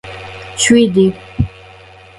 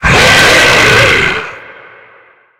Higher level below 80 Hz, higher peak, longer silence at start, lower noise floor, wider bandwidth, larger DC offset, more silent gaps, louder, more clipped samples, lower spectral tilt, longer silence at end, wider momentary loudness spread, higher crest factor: second, -34 dBFS vs -28 dBFS; about the same, 0 dBFS vs 0 dBFS; about the same, 0.05 s vs 0 s; second, -39 dBFS vs -43 dBFS; second, 11.5 kHz vs over 20 kHz; neither; neither; second, -13 LUFS vs -5 LUFS; second, under 0.1% vs 0.5%; first, -4.5 dB/octave vs -2.5 dB/octave; second, 0.7 s vs 0.9 s; first, 18 LU vs 12 LU; first, 16 dB vs 10 dB